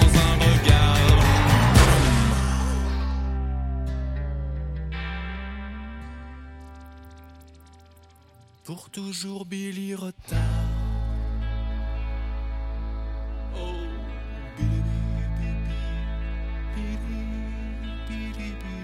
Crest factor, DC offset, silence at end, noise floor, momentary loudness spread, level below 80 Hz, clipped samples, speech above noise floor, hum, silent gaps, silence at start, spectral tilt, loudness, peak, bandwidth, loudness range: 20 dB; under 0.1%; 0 s; -53 dBFS; 19 LU; -28 dBFS; under 0.1%; 24 dB; none; none; 0 s; -5.5 dB/octave; -25 LUFS; -4 dBFS; 16 kHz; 18 LU